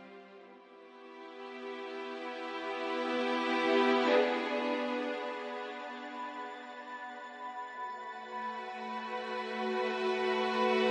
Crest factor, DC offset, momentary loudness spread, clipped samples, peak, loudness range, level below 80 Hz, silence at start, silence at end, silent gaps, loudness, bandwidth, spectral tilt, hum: 18 dB; under 0.1%; 20 LU; under 0.1%; -16 dBFS; 10 LU; -84 dBFS; 0 s; 0 s; none; -34 LUFS; 10 kHz; -4 dB/octave; none